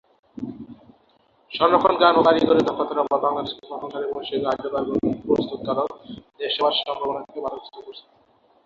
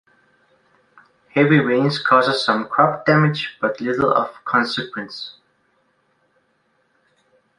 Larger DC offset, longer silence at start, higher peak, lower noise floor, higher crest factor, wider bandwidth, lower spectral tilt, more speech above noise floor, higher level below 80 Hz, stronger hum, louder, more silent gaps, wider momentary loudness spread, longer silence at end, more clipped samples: neither; second, 0.35 s vs 1.35 s; about the same, -2 dBFS vs -2 dBFS; second, -60 dBFS vs -65 dBFS; about the same, 20 dB vs 20 dB; second, 7.4 kHz vs 11 kHz; about the same, -6.5 dB/octave vs -6.5 dB/octave; second, 38 dB vs 47 dB; about the same, -58 dBFS vs -62 dBFS; neither; second, -22 LUFS vs -18 LUFS; neither; first, 20 LU vs 13 LU; second, 0.65 s vs 2.25 s; neither